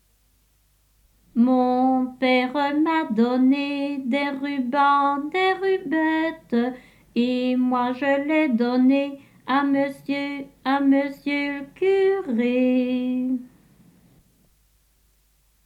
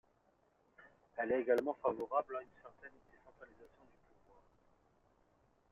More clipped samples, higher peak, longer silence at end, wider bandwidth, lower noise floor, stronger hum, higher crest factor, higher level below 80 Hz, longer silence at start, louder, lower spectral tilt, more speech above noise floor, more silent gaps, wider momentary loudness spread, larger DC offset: neither; first, -8 dBFS vs -20 dBFS; first, 2.2 s vs 2.05 s; about the same, 7.6 kHz vs 7.6 kHz; second, -63 dBFS vs -75 dBFS; neither; second, 16 dB vs 24 dB; first, -64 dBFS vs -78 dBFS; first, 1.35 s vs 1.15 s; first, -22 LUFS vs -38 LUFS; first, -6 dB/octave vs -4.5 dB/octave; first, 41 dB vs 37 dB; neither; second, 8 LU vs 26 LU; neither